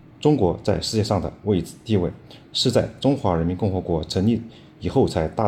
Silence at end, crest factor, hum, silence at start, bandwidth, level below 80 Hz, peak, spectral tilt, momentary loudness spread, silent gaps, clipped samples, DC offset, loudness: 0 s; 18 dB; none; 0.2 s; 15.5 kHz; -46 dBFS; -4 dBFS; -6.5 dB/octave; 7 LU; none; under 0.1%; under 0.1%; -22 LUFS